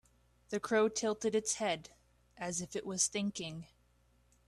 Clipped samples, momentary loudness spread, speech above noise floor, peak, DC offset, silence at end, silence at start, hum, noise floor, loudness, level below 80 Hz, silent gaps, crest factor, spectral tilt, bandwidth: under 0.1%; 12 LU; 35 dB; -16 dBFS; under 0.1%; 0.85 s; 0.5 s; 60 Hz at -70 dBFS; -70 dBFS; -35 LUFS; -70 dBFS; none; 22 dB; -3 dB/octave; 13 kHz